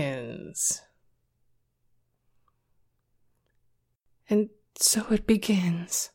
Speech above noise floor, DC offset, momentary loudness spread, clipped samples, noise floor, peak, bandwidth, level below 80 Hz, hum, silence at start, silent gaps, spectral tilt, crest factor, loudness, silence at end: 45 dB; under 0.1%; 12 LU; under 0.1%; -71 dBFS; -10 dBFS; 16.5 kHz; -54 dBFS; none; 0 s; none; -3.5 dB/octave; 22 dB; -26 LUFS; 0.05 s